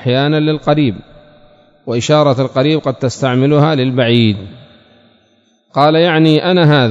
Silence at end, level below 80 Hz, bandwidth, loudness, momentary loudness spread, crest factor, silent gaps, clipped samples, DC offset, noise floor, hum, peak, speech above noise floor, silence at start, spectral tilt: 0 s; -52 dBFS; 7.8 kHz; -12 LUFS; 9 LU; 12 dB; none; 0.2%; under 0.1%; -55 dBFS; none; 0 dBFS; 43 dB; 0 s; -6.5 dB/octave